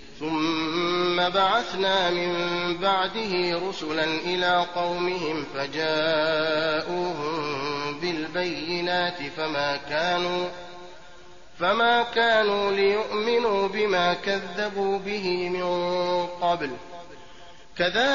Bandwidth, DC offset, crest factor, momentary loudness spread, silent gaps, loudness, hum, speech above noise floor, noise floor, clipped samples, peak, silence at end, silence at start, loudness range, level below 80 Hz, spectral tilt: 7.2 kHz; 0.6%; 16 dB; 7 LU; none; -25 LUFS; none; 25 dB; -50 dBFS; under 0.1%; -10 dBFS; 0 s; 0 s; 4 LU; -58 dBFS; -1.5 dB/octave